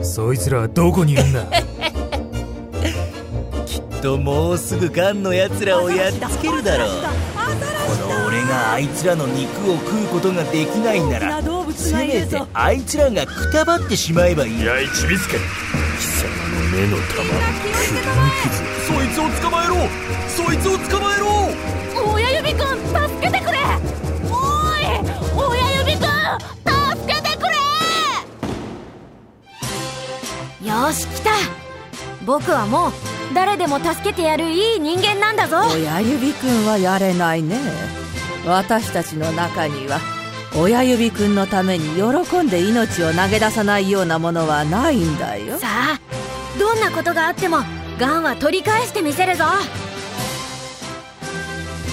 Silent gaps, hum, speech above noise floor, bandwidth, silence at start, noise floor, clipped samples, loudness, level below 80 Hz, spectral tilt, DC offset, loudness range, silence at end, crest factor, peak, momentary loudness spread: none; none; 26 dB; 16 kHz; 0 s; -44 dBFS; under 0.1%; -19 LUFS; -32 dBFS; -4.5 dB/octave; under 0.1%; 4 LU; 0 s; 18 dB; 0 dBFS; 10 LU